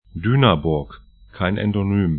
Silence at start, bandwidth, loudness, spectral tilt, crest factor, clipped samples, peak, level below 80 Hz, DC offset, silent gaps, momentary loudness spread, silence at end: 0.15 s; 4.4 kHz; -20 LUFS; -12 dB/octave; 20 dB; under 0.1%; 0 dBFS; -40 dBFS; under 0.1%; none; 9 LU; 0 s